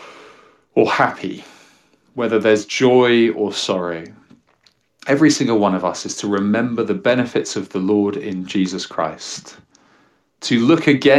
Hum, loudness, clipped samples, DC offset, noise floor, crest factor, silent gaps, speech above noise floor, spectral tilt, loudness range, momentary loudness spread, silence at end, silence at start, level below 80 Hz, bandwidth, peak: none; -18 LUFS; under 0.1%; under 0.1%; -59 dBFS; 16 dB; none; 42 dB; -5 dB/octave; 4 LU; 15 LU; 0 s; 0 s; -64 dBFS; 12 kHz; -2 dBFS